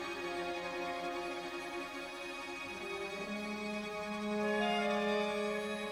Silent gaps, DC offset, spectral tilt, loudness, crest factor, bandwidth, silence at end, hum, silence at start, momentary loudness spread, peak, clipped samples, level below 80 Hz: none; under 0.1%; -4 dB/octave; -38 LUFS; 16 dB; 16 kHz; 0 s; none; 0 s; 9 LU; -22 dBFS; under 0.1%; -68 dBFS